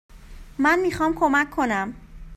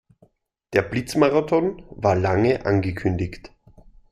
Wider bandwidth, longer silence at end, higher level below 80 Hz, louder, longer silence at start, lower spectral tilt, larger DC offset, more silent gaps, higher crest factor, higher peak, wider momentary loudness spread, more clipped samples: about the same, 14.5 kHz vs 14.5 kHz; second, 0 s vs 0.65 s; about the same, -44 dBFS vs -48 dBFS; about the same, -22 LUFS vs -22 LUFS; second, 0.15 s vs 0.7 s; second, -5 dB/octave vs -7 dB/octave; neither; neither; about the same, 18 dB vs 20 dB; about the same, -6 dBFS vs -4 dBFS; about the same, 10 LU vs 9 LU; neither